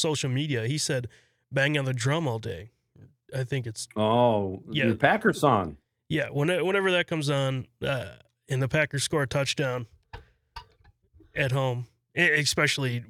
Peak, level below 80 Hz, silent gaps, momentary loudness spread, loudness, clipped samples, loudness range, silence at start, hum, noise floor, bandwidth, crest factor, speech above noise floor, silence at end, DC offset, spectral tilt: -4 dBFS; -58 dBFS; none; 14 LU; -26 LUFS; under 0.1%; 5 LU; 0 s; none; -61 dBFS; 15.5 kHz; 24 dB; 35 dB; 0.05 s; under 0.1%; -4.5 dB/octave